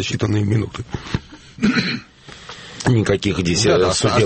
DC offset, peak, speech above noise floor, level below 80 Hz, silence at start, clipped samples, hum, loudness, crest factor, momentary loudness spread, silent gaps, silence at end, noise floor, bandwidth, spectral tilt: under 0.1%; -4 dBFS; 21 dB; -40 dBFS; 0 s; under 0.1%; none; -19 LUFS; 16 dB; 16 LU; none; 0 s; -38 dBFS; 8.8 kHz; -5 dB/octave